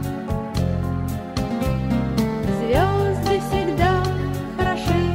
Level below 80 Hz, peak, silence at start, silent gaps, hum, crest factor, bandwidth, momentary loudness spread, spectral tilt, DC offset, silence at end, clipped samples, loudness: -32 dBFS; -6 dBFS; 0 s; none; none; 14 dB; 16 kHz; 7 LU; -7 dB/octave; under 0.1%; 0 s; under 0.1%; -22 LUFS